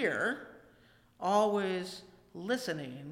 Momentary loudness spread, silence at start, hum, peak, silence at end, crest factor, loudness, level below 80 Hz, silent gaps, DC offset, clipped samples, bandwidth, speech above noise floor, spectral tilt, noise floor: 19 LU; 0 s; 60 Hz at -70 dBFS; -16 dBFS; 0 s; 18 dB; -34 LUFS; -74 dBFS; none; under 0.1%; under 0.1%; 16.5 kHz; 31 dB; -4.5 dB/octave; -63 dBFS